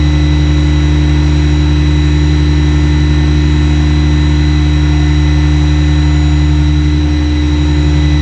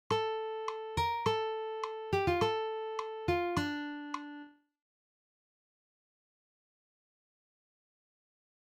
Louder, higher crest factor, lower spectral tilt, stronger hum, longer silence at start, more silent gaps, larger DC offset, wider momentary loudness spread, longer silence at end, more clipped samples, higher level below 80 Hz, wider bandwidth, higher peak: first, -11 LUFS vs -35 LUFS; second, 8 dB vs 20 dB; first, -7 dB/octave vs -5.5 dB/octave; neither; about the same, 0 s vs 0.1 s; neither; first, 1% vs under 0.1%; second, 1 LU vs 10 LU; second, 0 s vs 4.15 s; neither; first, -14 dBFS vs -58 dBFS; second, 8.2 kHz vs 16.5 kHz; first, 0 dBFS vs -18 dBFS